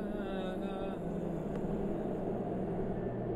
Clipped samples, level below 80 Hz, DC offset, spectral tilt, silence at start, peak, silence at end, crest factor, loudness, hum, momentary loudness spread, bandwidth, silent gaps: under 0.1%; -50 dBFS; under 0.1%; -9 dB/octave; 0 s; -24 dBFS; 0 s; 12 dB; -37 LUFS; none; 2 LU; 12 kHz; none